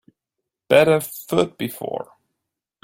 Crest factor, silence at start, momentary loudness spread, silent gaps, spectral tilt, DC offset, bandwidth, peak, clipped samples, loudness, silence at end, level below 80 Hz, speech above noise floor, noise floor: 20 dB; 0.7 s; 15 LU; none; -5 dB/octave; under 0.1%; 16.5 kHz; -2 dBFS; under 0.1%; -20 LUFS; 0.8 s; -60 dBFS; 63 dB; -83 dBFS